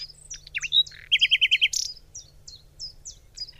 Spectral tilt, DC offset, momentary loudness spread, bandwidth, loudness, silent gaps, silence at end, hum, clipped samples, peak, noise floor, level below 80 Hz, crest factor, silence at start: 3 dB/octave; under 0.1%; 24 LU; 15.5 kHz; -21 LUFS; none; 0.1 s; none; under 0.1%; -10 dBFS; -48 dBFS; -54 dBFS; 18 dB; 0 s